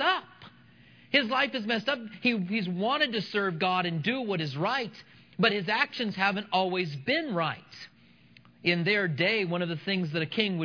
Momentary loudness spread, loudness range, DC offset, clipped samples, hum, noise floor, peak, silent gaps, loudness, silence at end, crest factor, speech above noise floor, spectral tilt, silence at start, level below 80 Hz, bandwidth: 7 LU; 1 LU; under 0.1%; under 0.1%; none; -58 dBFS; -8 dBFS; none; -28 LUFS; 0 s; 22 dB; 29 dB; -6.5 dB/octave; 0 s; -76 dBFS; 5.4 kHz